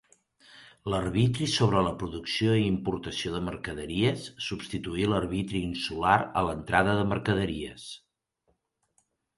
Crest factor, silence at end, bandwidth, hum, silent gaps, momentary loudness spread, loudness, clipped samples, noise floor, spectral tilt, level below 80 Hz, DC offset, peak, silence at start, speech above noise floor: 24 dB; 1.4 s; 11.5 kHz; none; none; 11 LU; -28 LUFS; under 0.1%; -75 dBFS; -5.5 dB/octave; -48 dBFS; under 0.1%; -6 dBFS; 0.55 s; 47 dB